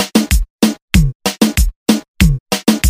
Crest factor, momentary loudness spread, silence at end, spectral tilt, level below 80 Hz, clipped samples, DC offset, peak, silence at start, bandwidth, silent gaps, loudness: 14 dB; 3 LU; 0 s; -4.5 dB/octave; -18 dBFS; under 0.1%; under 0.1%; 0 dBFS; 0 s; 16.5 kHz; 0.50-0.58 s, 0.82-0.88 s, 1.15-1.20 s, 1.76-1.86 s, 2.08-2.14 s, 2.40-2.46 s; -15 LUFS